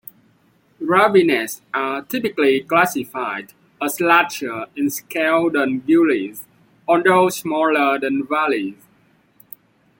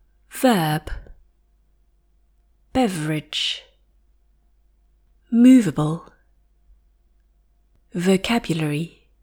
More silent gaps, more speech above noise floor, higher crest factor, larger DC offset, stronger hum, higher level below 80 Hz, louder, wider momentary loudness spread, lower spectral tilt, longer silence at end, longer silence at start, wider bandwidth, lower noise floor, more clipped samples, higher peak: neither; about the same, 40 dB vs 42 dB; about the same, 18 dB vs 18 dB; neither; neither; second, -66 dBFS vs -46 dBFS; about the same, -18 LUFS vs -20 LUFS; second, 12 LU vs 19 LU; about the same, -4.5 dB/octave vs -5.5 dB/octave; first, 1.25 s vs 0.35 s; first, 0.8 s vs 0.35 s; about the same, 17 kHz vs 18 kHz; about the same, -58 dBFS vs -60 dBFS; neither; about the same, -2 dBFS vs -4 dBFS